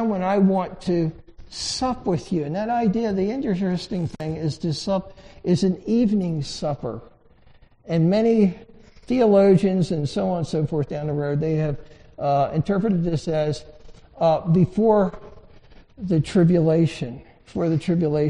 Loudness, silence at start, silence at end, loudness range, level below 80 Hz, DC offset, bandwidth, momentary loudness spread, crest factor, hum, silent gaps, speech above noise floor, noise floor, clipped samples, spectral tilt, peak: -22 LUFS; 0 s; 0 s; 4 LU; -46 dBFS; under 0.1%; 10.5 kHz; 10 LU; 16 dB; none; none; 31 dB; -52 dBFS; under 0.1%; -7.5 dB/octave; -6 dBFS